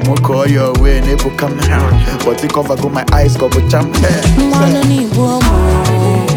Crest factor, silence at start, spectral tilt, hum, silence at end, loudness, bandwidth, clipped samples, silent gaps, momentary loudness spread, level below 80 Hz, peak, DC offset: 10 dB; 0 s; -6 dB/octave; none; 0 s; -12 LUFS; 19 kHz; under 0.1%; none; 4 LU; -16 dBFS; 0 dBFS; under 0.1%